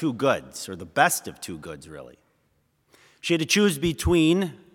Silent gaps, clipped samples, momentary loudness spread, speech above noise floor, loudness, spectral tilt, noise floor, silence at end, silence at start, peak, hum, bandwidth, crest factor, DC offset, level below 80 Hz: none; under 0.1%; 19 LU; 44 dB; -23 LUFS; -4 dB/octave; -68 dBFS; 0.2 s; 0 s; -4 dBFS; none; 18 kHz; 22 dB; under 0.1%; -46 dBFS